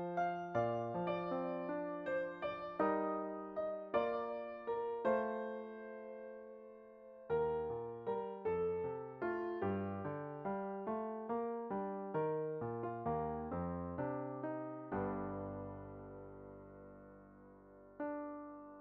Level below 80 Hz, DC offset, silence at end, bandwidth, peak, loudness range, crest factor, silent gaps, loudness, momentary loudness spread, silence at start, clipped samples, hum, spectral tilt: -68 dBFS; under 0.1%; 0 s; 6.2 kHz; -22 dBFS; 6 LU; 20 dB; none; -41 LUFS; 17 LU; 0 s; under 0.1%; none; -6.5 dB/octave